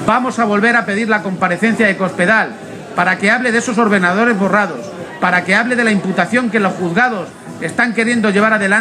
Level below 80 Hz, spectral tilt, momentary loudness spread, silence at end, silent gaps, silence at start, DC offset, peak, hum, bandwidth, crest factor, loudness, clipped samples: -58 dBFS; -5 dB/octave; 9 LU; 0 s; none; 0 s; under 0.1%; 0 dBFS; none; 12 kHz; 14 dB; -14 LUFS; under 0.1%